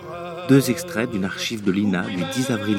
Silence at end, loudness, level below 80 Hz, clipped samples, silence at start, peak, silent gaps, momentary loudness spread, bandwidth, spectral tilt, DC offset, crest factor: 0 s; -22 LUFS; -58 dBFS; under 0.1%; 0 s; -4 dBFS; none; 7 LU; 17 kHz; -5.5 dB/octave; under 0.1%; 18 dB